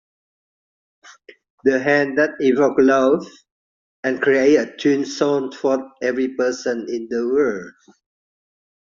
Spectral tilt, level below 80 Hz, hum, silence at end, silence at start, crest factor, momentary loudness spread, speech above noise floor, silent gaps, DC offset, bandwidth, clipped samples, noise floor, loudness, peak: -4 dB/octave; -64 dBFS; none; 1.2 s; 1.65 s; 16 dB; 10 LU; over 72 dB; 3.51-4.03 s; under 0.1%; 7.4 kHz; under 0.1%; under -90 dBFS; -19 LUFS; -4 dBFS